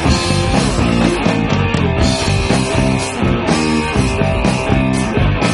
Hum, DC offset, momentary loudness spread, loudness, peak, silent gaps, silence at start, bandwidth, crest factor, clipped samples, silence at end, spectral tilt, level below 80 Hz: none; under 0.1%; 2 LU; -15 LUFS; 0 dBFS; none; 0 s; 11.5 kHz; 14 dB; under 0.1%; 0 s; -5.5 dB/octave; -24 dBFS